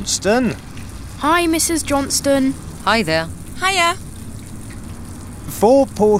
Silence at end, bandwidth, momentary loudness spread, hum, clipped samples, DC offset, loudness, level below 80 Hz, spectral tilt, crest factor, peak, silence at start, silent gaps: 0 s; 16.5 kHz; 19 LU; none; under 0.1%; under 0.1%; -17 LUFS; -38 dBFS; -3.5 dB/octave; 16 dB; -2 dBFS; 0 s; none